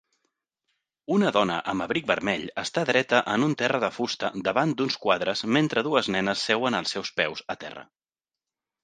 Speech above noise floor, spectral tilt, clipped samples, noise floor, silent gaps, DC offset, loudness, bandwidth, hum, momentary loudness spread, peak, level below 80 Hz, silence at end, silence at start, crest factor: over 65 dB; -4.5 dB/octave; under 0.1%; under -90 dBFS; none; under 0.1%; -25 LUFS; 9.8 kHz; none; 6 LU; -4 dBFS; -64 dBFS; 1 s; 1.1 s; 22 dB